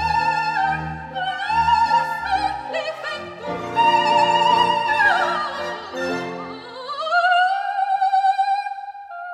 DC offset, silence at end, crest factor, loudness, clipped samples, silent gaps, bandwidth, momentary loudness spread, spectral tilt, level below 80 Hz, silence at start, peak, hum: under 0.1%; 0 s; 16 dB; -20 LUFS; under 0.1%; none; 13 kHz; 14 LU; -3.5 dB/octave; -48 dBFS; 0 s; -4 dBFS; none